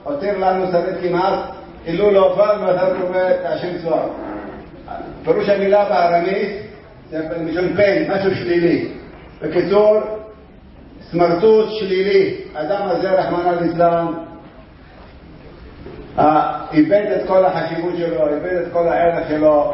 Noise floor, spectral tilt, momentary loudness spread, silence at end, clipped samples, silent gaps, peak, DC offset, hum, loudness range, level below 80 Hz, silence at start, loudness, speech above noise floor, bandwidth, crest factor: -41 dBFS; -10.5 dB/octave; 15 LU; 0 s; under 0.1%; none; -2 dBFS; under 0.1%; none; 3 LU; -46 dBFS; 0 s; -17 LUFS; 25 dB; 5.8 kHz; 16 dB